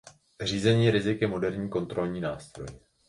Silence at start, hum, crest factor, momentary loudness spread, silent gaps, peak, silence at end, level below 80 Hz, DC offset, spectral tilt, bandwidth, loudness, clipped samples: 0.05 s; none; 18 dB; 18 LU; none; -10 dBFS; 0.3 s; -54 dBFS; under 0.1%; -6 dB/octave; 11.5 kHz; -28 LUFS; under 0.1%